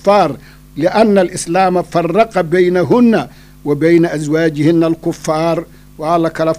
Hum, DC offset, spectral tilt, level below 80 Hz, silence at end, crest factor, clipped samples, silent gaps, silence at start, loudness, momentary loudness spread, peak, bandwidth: none; under 0.1%; -6.5 dB/octave; -44 dBFS; 0 s; 12 dB; under 0.1%; none; 0.05 s; -13 LUFS; 9 LU; 0 dBFS; 15.5 kHz